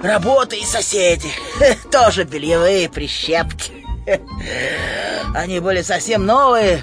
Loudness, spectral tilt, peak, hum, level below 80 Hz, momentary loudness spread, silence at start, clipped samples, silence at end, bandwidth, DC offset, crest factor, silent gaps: -16 LUFS; -3.5 dB/octave; -2 dBFS; none; -32 dBFS; 9 LU; 0 s; under 0.1%; 0 s; 10.5 kHz; under 0.1%; 14 dB; none